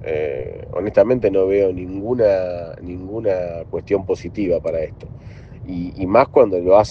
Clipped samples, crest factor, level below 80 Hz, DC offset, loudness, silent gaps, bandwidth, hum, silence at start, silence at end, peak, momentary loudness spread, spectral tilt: under 0.1%; 18 dB; -44 dBFS; under 0.1%; -19 LUFS; none; 6.8 kHz; none; 0 s; 0 s; 0 dBFS; 16 LU; -8 dB/octave